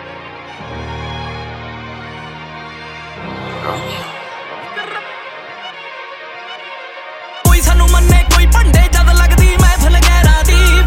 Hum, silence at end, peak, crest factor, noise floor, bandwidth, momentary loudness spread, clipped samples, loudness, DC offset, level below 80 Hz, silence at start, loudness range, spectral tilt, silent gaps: none; 0 s; 0 dBFS; 12 dB; -30 dBFS; 16.5 kHz; 19 LU; under 0.1%; -12 LUFS; under 0.1%; -14 dBFS; 0 s; 16 LU; -4.5 dB/octave; none